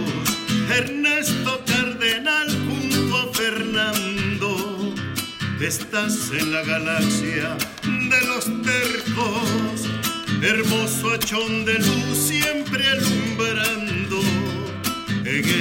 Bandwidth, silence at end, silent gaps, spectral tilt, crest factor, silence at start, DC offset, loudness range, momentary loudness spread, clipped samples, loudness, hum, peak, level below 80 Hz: 16.5 kHz; 0 s; none; -3.5 dB/octave; 16 dB; 0 s; under 0.1%; 3 LU; 6 LU; under 0.1%; -21 LUFS; none; -6 dBFS; -52 dBFS